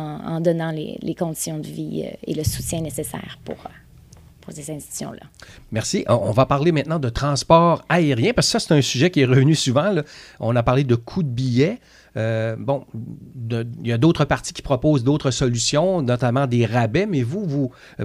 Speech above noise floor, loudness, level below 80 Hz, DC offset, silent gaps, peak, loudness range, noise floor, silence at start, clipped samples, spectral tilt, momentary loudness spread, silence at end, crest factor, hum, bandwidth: 26 dB; -20 LUFS; -44 dBFS; under 0.1%; none; -2 dBFS; 11 LU; -47 dBFS; 0 s; under 0.1%; -5.5 dB/octave; 16 LU; 0 s; 20 dB; none; 15 kHz